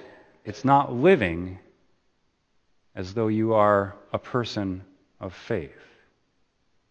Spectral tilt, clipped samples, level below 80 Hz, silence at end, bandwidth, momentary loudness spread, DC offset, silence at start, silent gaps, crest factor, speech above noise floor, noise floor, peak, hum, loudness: -7.5 dB/octave; under 0.1%; -58 dBFS; 1.25 s; 8.4 kHz; 20 LU; under 0.1%; 0 s; none; 22 dB; 46 dB; -70 dBFS; -4 dBFS; none; -24 LUFS